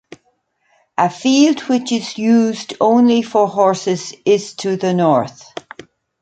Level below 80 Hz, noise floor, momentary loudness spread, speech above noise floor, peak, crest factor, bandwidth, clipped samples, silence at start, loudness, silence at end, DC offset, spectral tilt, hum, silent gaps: -64 dBFS; -63 dBFS; 10 LU; 48 dB; -2 dBFS; 14 dB; 9 kHz; under 0.1%; 1 s; -15 LUFS; 0.9 s; under 0.1%; -5 dB/octave; none; none